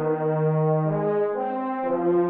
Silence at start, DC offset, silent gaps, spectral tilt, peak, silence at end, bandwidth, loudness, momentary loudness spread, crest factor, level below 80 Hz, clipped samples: 0 s; under 0.1%; none; -9.5 dB/octave; -12 dBFS; 0 s; 3.7 kHz; -24 LUFS; 5 LU; 10 dB; -74 dBFS; under 0.1%